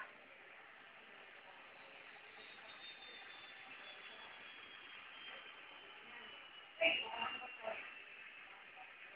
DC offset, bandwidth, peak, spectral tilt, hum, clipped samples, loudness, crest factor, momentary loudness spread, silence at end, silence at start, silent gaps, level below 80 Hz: under 0.1%; 5.2 kHz; -20 dBFS; 2 dB/octave; none; under 0.1%; -47 LUFS; 28 dB; 17 LU; 0 s; 0 s; none; -88 dBFS